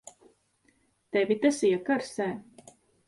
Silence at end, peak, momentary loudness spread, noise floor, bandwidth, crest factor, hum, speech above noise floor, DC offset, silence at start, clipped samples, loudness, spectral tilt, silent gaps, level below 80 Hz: 0.65 s; -10 dBFS; 9 LU; -69 dBFS; 11.5 kHz; 20 dB; none; 42 dB; under 0.1%; 1.15 s; under 0.1%; -28 LUFS; -4.5 dB/octave; none; -72 dBFS